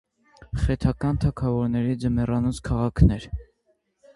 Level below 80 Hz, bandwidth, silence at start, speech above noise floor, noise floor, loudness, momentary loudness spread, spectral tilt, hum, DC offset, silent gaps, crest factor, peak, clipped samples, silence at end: -32 dBFS; 11.5 kHz; 0.4 s; 47 dB; -69 dBFS; -24 LUFS; 11 LU; -8 dB/octave; none; under 0.1%; none; 20 dB; -4 dBFS; under 0.1%; 0.75 s